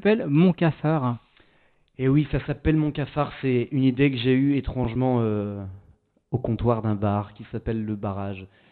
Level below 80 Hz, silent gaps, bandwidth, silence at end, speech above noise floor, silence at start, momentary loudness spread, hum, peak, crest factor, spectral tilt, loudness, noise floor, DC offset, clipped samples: -44 dBFS; none; 4.5 kHz; 0.25 s; 38 dB; 0 s; 12 LU; none; -8 dBFS; 16 dB; -11.5 dB/octave; -24 LUFS; -61 dBFS; under 0.1%; under 0.1%